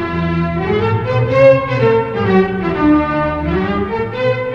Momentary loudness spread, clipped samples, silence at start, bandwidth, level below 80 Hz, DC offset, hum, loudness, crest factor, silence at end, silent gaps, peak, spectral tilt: 7 LU; under 0.1%; 0 s; 7 kHz; -34 dBFS; under 0.1%; none; -14 LUFS; 14 dB; 0 s; none; 0 dBFS; -9 dB/octave